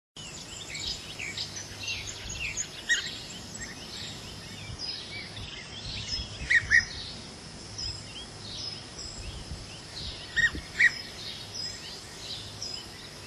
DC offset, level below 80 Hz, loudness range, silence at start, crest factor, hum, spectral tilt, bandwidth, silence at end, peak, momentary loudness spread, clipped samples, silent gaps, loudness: under 0.1%; -50 dBFS; 8 LU; 0.15 s; 24 dB; none; -1.5 dB/octave; 15.5 kHz; 0 s; -10 dBFS; 17 LU; under 0.1%; none; -31 LUFS